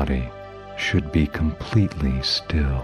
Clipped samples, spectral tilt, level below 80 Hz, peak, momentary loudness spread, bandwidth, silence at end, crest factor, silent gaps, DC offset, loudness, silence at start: under 0.1%; -6 dB/octave; -30 dBFS; -6 dBFS; 10 LU; 11.5 kHz; 0 s; 16 dB; none; under 0.1%; -23 LUFS; 0 s